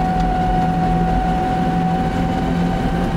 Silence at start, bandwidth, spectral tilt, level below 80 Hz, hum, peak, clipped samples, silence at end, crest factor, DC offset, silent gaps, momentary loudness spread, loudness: 0 s; 11 kHz; -7.5 dB/octave; -26 dBFS; none; -6 dBFS; under 0.1%; 0 s; 10 dB; under 0.1%; none; 2 LU; -18 LUFS